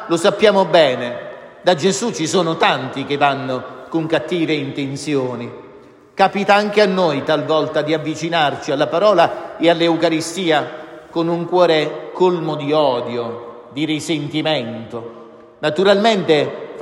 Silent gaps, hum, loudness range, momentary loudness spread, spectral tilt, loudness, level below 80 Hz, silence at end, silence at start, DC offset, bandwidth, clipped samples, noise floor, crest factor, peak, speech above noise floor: none; none; 4 LU; 13 LU; -4.5 dB/octave; -17 LUFS; -64 dBFS; 0 s; 0 s; under 0.1%; 12.5 kHz; under 0.1%; -43 dBFS; 16 dB; 0 dBFS; 26 dB